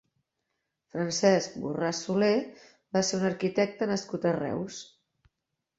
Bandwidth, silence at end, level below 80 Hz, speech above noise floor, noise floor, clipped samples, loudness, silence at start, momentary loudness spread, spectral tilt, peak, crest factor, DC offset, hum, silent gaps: 8 kHz; 0.95 s; -68 dBFS; 56 dB; -84 dBFS; under 0.1%; -28 LUFS; 0.95 s; 11 LU; -4.5 dB/octave; -8 dBFS; 20 dB; under 0.1%; none; none